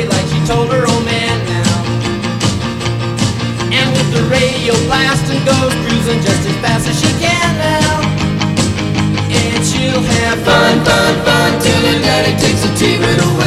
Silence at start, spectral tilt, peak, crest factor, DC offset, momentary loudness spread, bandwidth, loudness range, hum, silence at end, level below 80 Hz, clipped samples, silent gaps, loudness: 0 s; -4.5 dB/octave; 0 dBFS; 12 dB; under 0.1%; 5 LU; 15 kHz; 4 LU; none; 0 s; -32 dBFS; under 0.1%; none; -12 LUFS